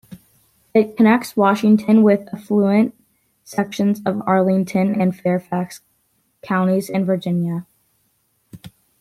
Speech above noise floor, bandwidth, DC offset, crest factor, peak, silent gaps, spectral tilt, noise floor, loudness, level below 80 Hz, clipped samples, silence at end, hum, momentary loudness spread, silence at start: 48 dB; 14.5 kHz; under 0.1%; 16 dB; -2 dBFS; none; -7.5 dB/octave; -65 dBFS; -18 LUFS; -62 dBFS; under 0.1%; 0.3 s; none; 10 LU; 0.1 s